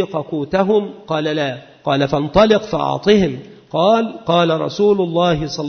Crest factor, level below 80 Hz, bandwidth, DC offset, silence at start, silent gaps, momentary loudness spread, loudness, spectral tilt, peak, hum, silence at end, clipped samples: 16 dB; -42 dBFS; 6.6 kHz; under 0.1%; 0 s; none; 9 LU; -17 LUFS; -6.5 dB/octave; -2 dBFS; none; 0 s; under 0.1%